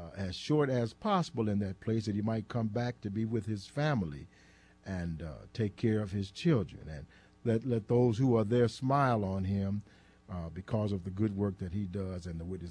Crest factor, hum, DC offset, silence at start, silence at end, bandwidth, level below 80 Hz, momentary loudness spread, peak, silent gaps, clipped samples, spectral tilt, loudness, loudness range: 16 dB; none; under 0.1%; 0 s; 0 s; 10.5 kHz; -58 dBFS; 13 LU; -16 dBFS; none; under 0.1%; -7.5 dB/octave; -33 LUFS; 5 LU